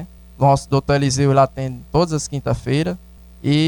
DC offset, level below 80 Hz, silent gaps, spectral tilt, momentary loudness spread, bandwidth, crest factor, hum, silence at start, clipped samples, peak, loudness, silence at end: under 0.1%; -40 dBFS; none; -6 dB/octave; 11 LU; 18.5 kHz; 14 dB; none; 0 s; under 0.1%; -4 dBFS; -19 LUFS; 0 s